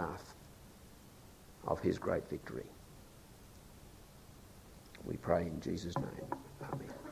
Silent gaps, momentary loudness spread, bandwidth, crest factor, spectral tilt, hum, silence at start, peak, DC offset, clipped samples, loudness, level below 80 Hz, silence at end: none; 22 LU; 16 kHz; 26 dB; -6.5 dB/octave; none; 0 s; -16 dBFS; under 0.1%; under 0.1%; -40 LUFS; -58 dBFS; 0 s